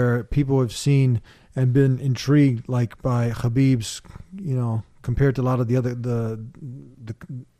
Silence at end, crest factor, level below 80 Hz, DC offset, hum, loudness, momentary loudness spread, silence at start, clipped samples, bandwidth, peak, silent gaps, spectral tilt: 0.15 s; 14 dB; -42 dBFS; under 0.1%; none; -22 LUFS; 17 LU; 0 s; under 0.1%; 13 kHz; -8 dBFS; none; -7.5 dB/octave